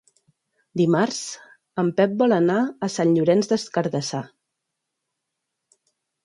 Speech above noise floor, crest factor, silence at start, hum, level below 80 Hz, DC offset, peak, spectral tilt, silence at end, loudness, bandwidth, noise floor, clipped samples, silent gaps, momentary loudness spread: 60 dB; 18 dB; 0.75 s; none; -70 dBFS; under 0.1%; -6 dBFS; -5.5 dB/octave; 2 s; -22 LUFS; 11.5 kHz; -81 dBFS; under 0.1%; none; 14 LU